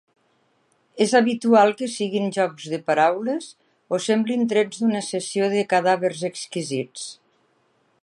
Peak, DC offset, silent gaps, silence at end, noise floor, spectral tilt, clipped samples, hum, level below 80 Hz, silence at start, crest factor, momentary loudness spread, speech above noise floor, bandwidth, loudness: -4 dBFS; under 0.1%; none; 0.9 s; -65 dBFS; -4.5 dB/octave; under 0.1%; none; -76 dBFS; 0.95 s; 18 dB; 11 LU; 44 dB; 11.5 kHz; -22 LUFS